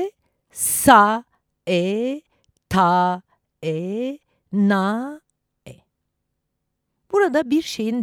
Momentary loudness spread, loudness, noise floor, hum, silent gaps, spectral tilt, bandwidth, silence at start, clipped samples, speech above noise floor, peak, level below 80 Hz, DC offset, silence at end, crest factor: 18 LU; -19 LUFS; -77 dBFS; none; none; -4.5 dB/octave; over 20 kHz; 0 s; under 0.1%; 58 dB; 0 dBFS; -54 dBFS; under 0.1%; 0 s; 22 dB